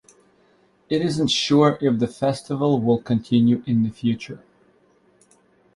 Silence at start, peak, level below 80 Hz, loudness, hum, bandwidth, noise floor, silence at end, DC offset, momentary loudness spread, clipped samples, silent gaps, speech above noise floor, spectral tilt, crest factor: 0.9 s; -4 dBFS; -58 dBFS; -21 LUFS; none; 11.5 kHz; -59 dBFS; 1.4 s; under 0.1%; 8 LU; under 0.1%; none; 39 dB; -6 dB/octave; 18 dB